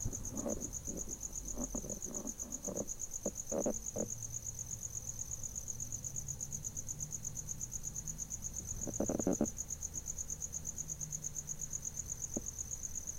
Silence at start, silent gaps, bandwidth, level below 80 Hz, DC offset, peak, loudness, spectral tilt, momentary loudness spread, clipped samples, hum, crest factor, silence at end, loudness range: 0 s; none; 16 kHz; -52 dBFS; under 0.1%; -20 dBFS; -40 LUFS; -4 dB/octave; 4 LU; under 0.1%; none; 22 dB; 0 s; 2 LU